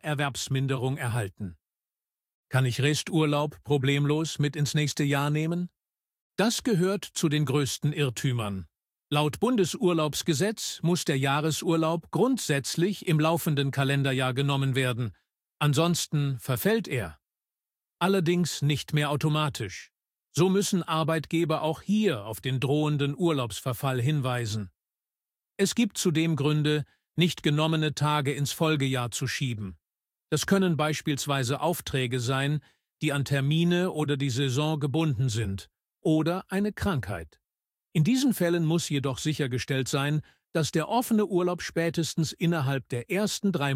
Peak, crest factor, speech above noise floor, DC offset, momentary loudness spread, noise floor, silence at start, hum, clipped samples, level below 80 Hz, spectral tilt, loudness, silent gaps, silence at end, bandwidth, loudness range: -10 dBFS; 18 dB; over 64 dB; under 0.1%; 7 LU; under -90 dBFS; 0.05 s; none; under 0.1%; -58 dBFS; -5.5 dB/octave; -27 LUFS; 2.34-2.44 s, 6.21-6.31 s; 0 s; 16 kHz; 2 LU